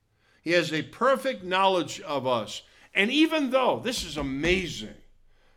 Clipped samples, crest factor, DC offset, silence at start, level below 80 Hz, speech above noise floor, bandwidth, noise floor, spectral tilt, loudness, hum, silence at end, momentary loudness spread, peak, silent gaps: under 0.1%; 20 dB; under 0.1%; 0.45 s; -50 dBFS; 32 dB; 17 kHz; -57 dBFS; -4 dB/octave; -26 LUFS; none; 0.65 s; 13 LU; -6 dBFS; none